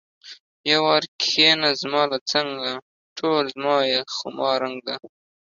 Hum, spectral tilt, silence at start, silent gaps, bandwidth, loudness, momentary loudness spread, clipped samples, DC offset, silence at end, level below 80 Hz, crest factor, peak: none; -3 dB/octave; 0.25 s; 0.40-0.64 s, 1.08-1.19 s, 2.21-2.26 s, 2.82-3.16 s; 7.6 kHz; -21 LUFS; 14 LU; under 0.1%; under 0.1%; 0.45 s; -70 dBFS; 18 dB; -4 dBFS